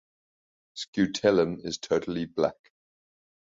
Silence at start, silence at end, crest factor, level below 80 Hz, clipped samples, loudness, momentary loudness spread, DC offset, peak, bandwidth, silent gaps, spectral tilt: 0.75 s; 1.05 s; 20 dB; -62 dBFS; under 0.1%; -27 LUFS; 11 LU; under 0.1%; -8 dBFS; 7.8 kHz; 0.88-0.93 s; -5 dB/octave